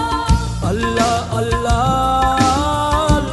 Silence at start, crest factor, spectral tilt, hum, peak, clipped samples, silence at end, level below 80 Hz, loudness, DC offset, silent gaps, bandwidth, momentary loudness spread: 0 s; 14 dB; -5 dB/octave; none; 0 dBFS; under 0.1%; 0 s; -24 dBFS; -16 LUFS; under 0.1%; none; 12 kHz; 4 LU